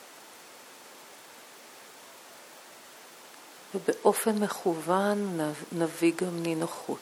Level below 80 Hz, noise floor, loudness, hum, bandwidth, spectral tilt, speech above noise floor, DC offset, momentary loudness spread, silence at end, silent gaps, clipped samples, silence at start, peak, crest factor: -80 dBFS; -50 dBFS; -29 LUFS; none; 18.5 kHz; -5 dB/octave; 22 dB; under 0.1%; 22 LU; 0 s; none; under 0.1%; 0 s; -8 dBFS; 24 dB